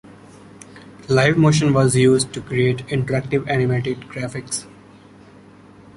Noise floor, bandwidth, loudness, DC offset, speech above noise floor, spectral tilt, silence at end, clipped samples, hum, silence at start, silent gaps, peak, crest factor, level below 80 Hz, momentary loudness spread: -45 dBFS; 11.5 kHz; -19 LUFS; under 0.1%; 27 dB; -5.5 dB/octave; 1.3 s; under 0.1%; none; 0.75 s; none; -2 dBFS; 18 dB; -50 dBFS; 13 LU